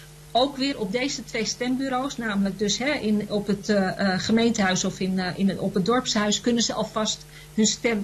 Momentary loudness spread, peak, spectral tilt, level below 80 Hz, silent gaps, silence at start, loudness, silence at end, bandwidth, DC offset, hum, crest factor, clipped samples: 5 LU; -10 dBFS; -4 dB/octave; -52 dBFS; none; 0 s; -24 LUFS; 0 s; 13 kHz; under 0.1%; none; 14 dB; under 0.1%